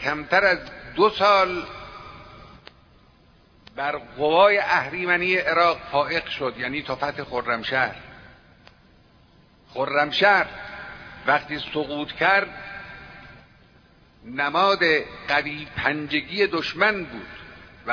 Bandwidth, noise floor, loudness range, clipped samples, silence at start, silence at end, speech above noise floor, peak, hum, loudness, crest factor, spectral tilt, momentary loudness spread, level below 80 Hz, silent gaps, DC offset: 5.4 kHz; -55 dBFS; 6 LU; under 0.1%; 0 s; 0 s; 33 dB; -4 dBFS; none; -22 LUFS; 20 dB; -5 dB/octave; 21 LU; -54 dBFS; none; under 0.1%